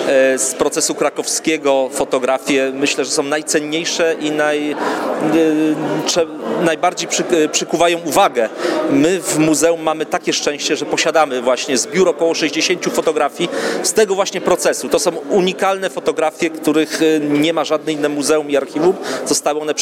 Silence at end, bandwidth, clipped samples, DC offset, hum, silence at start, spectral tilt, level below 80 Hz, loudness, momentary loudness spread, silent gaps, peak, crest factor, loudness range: 0 s; 16.5 kHz; under 0.1%; under 0.1%; none; 0 s; -3 dB/octave; -58 dBFS; -16 LUFS; 4 LU; none; 0 dBFS; 16 dB; 1 LU